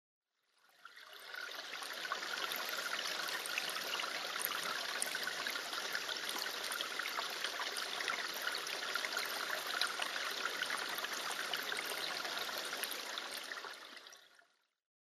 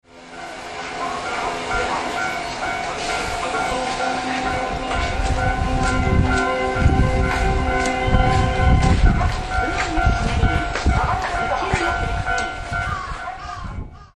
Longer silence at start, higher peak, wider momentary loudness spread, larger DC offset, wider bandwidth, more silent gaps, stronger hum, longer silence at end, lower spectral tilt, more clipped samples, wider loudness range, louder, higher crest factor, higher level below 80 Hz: first, 0.8 s vs 0.15 s; second, -16 dBFS vs -2 dBFS; second, 7 LU vs 11 LU; neither; first, 15.5 kHz vs 11.5 kHz; neither; neither; first, 0.65 s vs 0.1 s; second, 1 dB/octave vs -5.5 dB/octave; neither; about the same, 3 LU vs 5 LU; second, -39 LUFS vs -21 LUFS; first, 26 dB vs 18 dB; second, -88 dBFS vs -24 dBFS